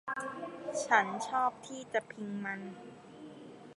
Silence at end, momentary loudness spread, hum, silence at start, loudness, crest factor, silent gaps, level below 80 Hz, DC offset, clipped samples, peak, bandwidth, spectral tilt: 0.05 s; 22 LU; none; 0.05 s; -34 LUFS; 26 dB; none; -80 dBFS; under 0.1%; under 0.1%; -12 dBFS; 11.5 kHz; -3.5 dB/octave